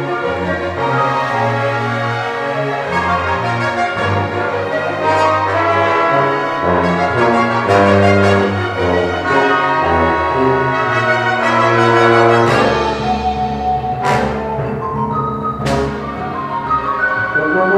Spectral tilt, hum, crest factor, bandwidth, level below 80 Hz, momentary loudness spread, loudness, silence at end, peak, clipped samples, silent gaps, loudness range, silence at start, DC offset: -6 dB/octave; none; 14 dB; 14 kHz; -38 dBFS; 8 LU; -15 LUFS; 0 s; 0 dBFS; under 0.1%; none; 5 LU; 0 s; under 0.1%